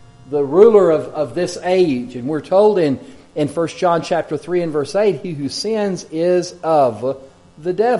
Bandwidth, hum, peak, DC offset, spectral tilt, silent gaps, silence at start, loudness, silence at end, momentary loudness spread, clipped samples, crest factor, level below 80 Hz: 11.5 kHz; none; 0 dBFS; under 0.1%; -6 dB/octave; none; 0.25 s; -17 LUFS; 0 s; 12 LU; under 0.1%; 16 dB; -56 dBFS